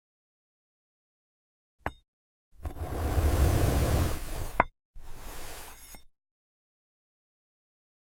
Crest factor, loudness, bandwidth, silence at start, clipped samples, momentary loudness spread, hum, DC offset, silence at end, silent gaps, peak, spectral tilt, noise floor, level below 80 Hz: 28 dB; -30 LUFS; 17 kHz; 1.85 s; under 0.1%; 20 LU; none; 0.1%; 2.05 s; 2.08-2.52 s, 4.85-4.94 s; -4 dBFS; -5.5 dB/octave; -48 dBFS; -36 dBFS